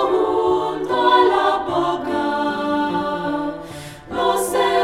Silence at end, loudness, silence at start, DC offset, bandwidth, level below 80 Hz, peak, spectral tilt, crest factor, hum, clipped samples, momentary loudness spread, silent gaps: 0 s; -19 LUFS; 0 s; under 0.1%; 16 kHz; -50 dBFS; -4 dBFS; -4 dB/octave; 16 dB; none; under 0.1%; 12 LU; none